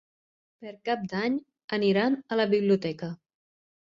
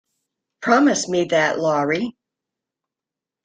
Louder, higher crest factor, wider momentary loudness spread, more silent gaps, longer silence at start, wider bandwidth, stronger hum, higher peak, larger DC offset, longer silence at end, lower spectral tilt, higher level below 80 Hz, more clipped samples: second, -27 LUFS vs -19 LUFS; about the same, 18 dB vs 20 dB; first, 16 LU vs 10 LU; first, 1.64-1.68 s vs none; about the same, 0.6 s vs 0.6 s; second, 7.4 kHz vs 9.4 kHz; neither; second, -12 dBFS vs -2 dBFS; neither; second, 0.7 s vs 1.35 s; first, -7.5 dB/octave vs -4 dB/octave; about the same, -70 dBFS vs -66 dBFS; neither